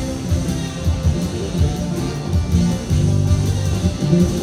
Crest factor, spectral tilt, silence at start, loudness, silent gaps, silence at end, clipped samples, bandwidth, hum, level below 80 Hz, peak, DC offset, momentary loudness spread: 14 dB; -6.5 dB/octave; 0 s; -19 LUFS; none; 0 s; under 0.1%; 14 kHz; none; -26 dBFS; -4 dBFS; under 0.1%; 6 LU